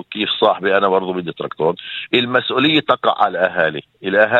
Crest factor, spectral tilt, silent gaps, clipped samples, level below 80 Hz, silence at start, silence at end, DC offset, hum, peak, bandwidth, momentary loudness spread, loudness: 16 dB; -6.5 dB/octave; none; under 0.1%; -62 dBFS; 0.1 s; 0 s; under 0.1%; none; 0 dBFS; 7.8 kHz; 9 LU; -17 LUFS